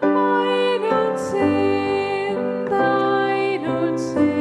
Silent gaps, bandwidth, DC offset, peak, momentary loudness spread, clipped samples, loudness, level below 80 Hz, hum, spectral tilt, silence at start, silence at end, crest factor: none; 11 kHz; under 0.1%; -6 dBFS; 4 LU; under 0.1%; -20 LUFS; -60 dBFS; none; -6 dB/octave; 0 s; 0 s; 14 dB